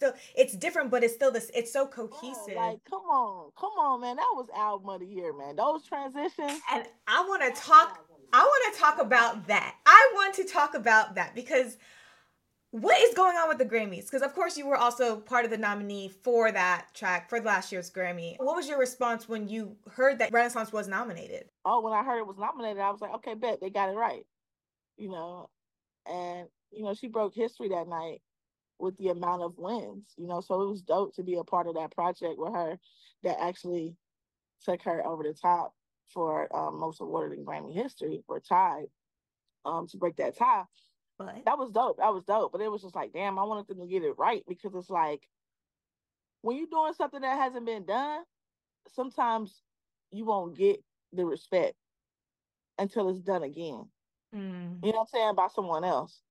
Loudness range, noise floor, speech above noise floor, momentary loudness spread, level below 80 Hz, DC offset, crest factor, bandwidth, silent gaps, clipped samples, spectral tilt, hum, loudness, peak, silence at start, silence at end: 12 LU; under -90 dBFS; over 61 dB; 16 LU; -84 dBFS; under 0.1%; 28 dB; 16 kHz; none; under 0.1%; -3.5 dB/octave; none; -28 LUFS; 0 dBFS; 0 s; 0.25 s